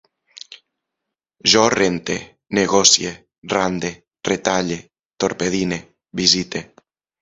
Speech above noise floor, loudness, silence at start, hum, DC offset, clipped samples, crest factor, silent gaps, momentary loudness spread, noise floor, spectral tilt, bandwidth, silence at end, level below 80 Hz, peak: 64 dB; -18 LUFS; 0.5 s; none; under 0.1%; under 0.1%; 20 dB; 3.38-3.42 s; 17 LU; -82 dBFS; -2.5 dB/octave; 10.5 kHz; 0.6 s; -52 dBFS; 0 dBFS